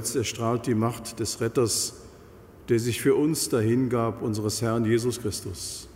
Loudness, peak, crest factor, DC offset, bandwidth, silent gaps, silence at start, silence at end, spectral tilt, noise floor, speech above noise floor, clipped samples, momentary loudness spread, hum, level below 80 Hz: -26 LUFS; -12 dBFS; 16 dB; under 0.1%; 16 kHz; none; 0 s; 0 s; -5 dB/octave; -48 dBFS; 23 dB; under 0.1%; 8 LU; none; -54 dBFS